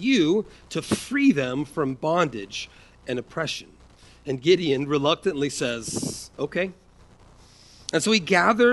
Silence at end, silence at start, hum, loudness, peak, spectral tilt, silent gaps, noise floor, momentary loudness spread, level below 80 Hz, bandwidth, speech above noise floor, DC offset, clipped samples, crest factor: 0 s; 0 s; none; -24 LUFS; -4 dBFS; -4.5 dB/octave; none; -52 dBFS; 13 LU; -56 dBFS; 11.5 kHz; 29 dB; under 0.1%; under 0.1%; 20 dB